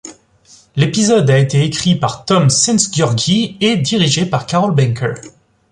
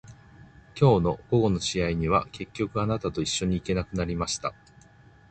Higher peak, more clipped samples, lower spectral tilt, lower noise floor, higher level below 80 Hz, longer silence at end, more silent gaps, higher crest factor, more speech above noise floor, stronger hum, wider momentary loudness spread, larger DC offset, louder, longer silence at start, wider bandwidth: first, 0 dBFS vs -6 dBFS; neither; about the same, -4.5 dB/octave vs -5.5 dB/octave; second, -47 dBFS vs -54 dBFS; about the same, -48 dBFS vs -44 dBFS; second, 0.4 s vs 0.8 s; neither; second, 14 dB vs 20 dB; first, 34 dB vs 29 dB; neither; second, 6 LU vs 10 LU; neither; first, -14 LUFS vs -26 LUFS; about the same, 0.05 s vs 0.05 s; first, 11 kHz vs 9.2 kHz